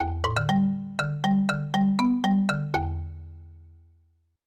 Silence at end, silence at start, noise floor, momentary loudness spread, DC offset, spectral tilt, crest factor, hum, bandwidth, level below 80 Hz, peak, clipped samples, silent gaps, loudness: 0.8 s; 0 s; -65 dBFS; 12 LU; under 0.1%; -6.5 dB/octave; 16 dB; none; 11.5 kHz; -46 dBFS; -10 dBFS; under 0.1%; none; -25 LUFS